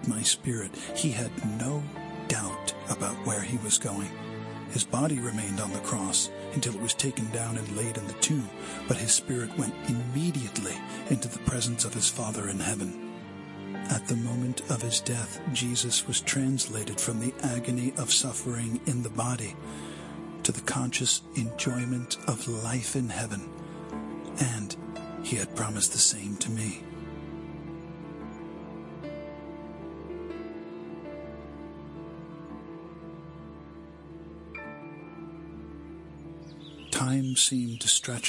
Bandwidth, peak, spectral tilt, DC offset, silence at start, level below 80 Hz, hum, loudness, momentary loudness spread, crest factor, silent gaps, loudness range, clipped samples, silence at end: 11.5 kHz; -8 dBFS; -3.5 dB/octave; under 0.1%; 0 s; -58 dBFS; none; -29 LUFS; 18 LU; 24 dB; none; 14 LU; under 0.1%; 0 s